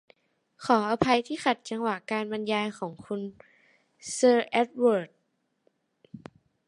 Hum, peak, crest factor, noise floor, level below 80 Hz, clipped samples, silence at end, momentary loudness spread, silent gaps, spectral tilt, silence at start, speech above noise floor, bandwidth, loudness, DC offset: none; -6 dBFS; 22 dB; -75 dBFS; -66 dBFS; under 0.1%; 0.5 s; 19 LU; none; -4.5 dB/octave; 0.6 s; 49 dB; 11.5 kHz; -27 LUFS; under 0.1%